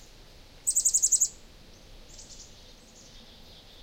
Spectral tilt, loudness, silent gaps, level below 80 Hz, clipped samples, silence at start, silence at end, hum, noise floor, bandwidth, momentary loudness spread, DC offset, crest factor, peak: 1 dB/octave; -23 LUFS; none; -54 dBFS; under 0.1%; 0 s; 0.3 s; none; -51 dBFS; 16.5 kHz; 26 LU; under 0.1%; 22 dB; -10 dBFS